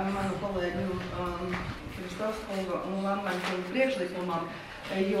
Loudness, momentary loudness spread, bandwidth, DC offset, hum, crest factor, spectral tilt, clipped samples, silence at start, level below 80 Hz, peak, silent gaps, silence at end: -32 LUFS; 7 LU; 15 kHz; under 0.1%; none; 18 dB; -6 dB/octave; under 0.1%; 0 s; -50 dBFS; -14 dBFS; none; 0 s